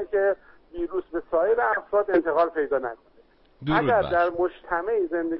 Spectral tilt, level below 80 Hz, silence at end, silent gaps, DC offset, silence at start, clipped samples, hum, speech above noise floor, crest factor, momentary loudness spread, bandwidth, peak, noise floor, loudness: -10.5 dB/octave; -52 dBFS; 0 s; none; under 0.1%; 0 s; under 0.1%; none; 34 dB; 14 dB; 11 LU; 5.8 kHz; -10 dBFS; -58 dBFS; -24 LUFS